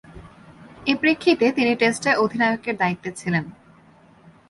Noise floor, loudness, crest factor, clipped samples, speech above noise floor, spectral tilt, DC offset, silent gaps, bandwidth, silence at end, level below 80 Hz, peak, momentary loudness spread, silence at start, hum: -52 dBFS; -21 LUFS; 20 dB; under 0.1%; 31 dB; -5 dB/octave; under 0.1%; none; 11.5 kHz; 1 s; -58 dBFS; -2 dBFS; 8 LU; 0.15 s; none